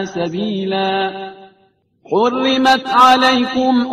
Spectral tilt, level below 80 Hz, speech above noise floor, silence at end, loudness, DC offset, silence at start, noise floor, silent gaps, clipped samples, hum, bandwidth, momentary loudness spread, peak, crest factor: -4.5 dB/octave; -56 dBFS; 43 dB; 0 s; -14 LUFS; under 0.1%; 0 s; -57 dBFS; none; under 0.1%; none; 14.5 kHz; 12 LU; 0 dBFS; 16 dB